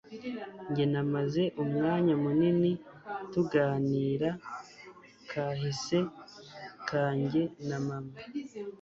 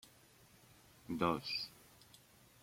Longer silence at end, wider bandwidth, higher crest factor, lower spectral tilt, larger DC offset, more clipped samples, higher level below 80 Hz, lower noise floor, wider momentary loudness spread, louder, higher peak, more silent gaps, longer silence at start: second, 0.05 s vs 0.85 s; second, 7.8 kHz vs 16.5 kHz; second, 18 dB vs 26 dB; first, -7 dB/octave vs -5 dB/octave; neither; neither; first, -66 dBFS vs -72 dBFS; second, -53 dBFS vs -65 dBFS; second, 16 LU vs 26 LU; first, -31 LUFS vs -40 LUFS; first, -14 dBFS vs -20 dBFS; neither; second, 0.05 s vs 1.1 s